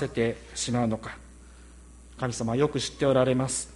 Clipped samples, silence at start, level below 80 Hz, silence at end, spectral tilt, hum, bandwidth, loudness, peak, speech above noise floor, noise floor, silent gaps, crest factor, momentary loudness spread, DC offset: under 0.1%; 0 s; -50 dBFS; 0 s; -5 dB/octave; none; 11.5 kHz; -27 LUFS; -10 dBFS; 22 dB; -49 dBFS; none; 18 dB; 11 LU; under 0.1%